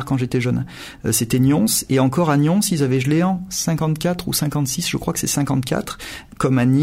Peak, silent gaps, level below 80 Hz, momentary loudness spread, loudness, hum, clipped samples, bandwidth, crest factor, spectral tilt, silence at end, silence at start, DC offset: -4 dBFS; none; -44 dBFS; 8 LU; -19 LUFS; none; under 0.1%; 16 kHz; 14 dB; -5 dB/octave; 0 s; 0 s; under 0.1%